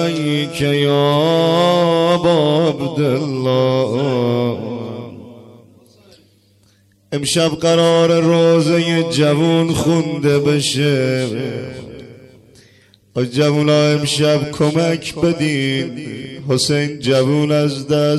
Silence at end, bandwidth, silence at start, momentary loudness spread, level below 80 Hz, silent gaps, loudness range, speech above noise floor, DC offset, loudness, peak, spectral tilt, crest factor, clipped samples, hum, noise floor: 0 s; 12.5 kHz; 0 s; 12 LU; -50 dBFS; none; 6 LU; 39 dB; under 0.1%; -15 LUFS; -4 dBFS; -5.5 dB/octave; 12 dB; under 0.1%; none; -54 dBFS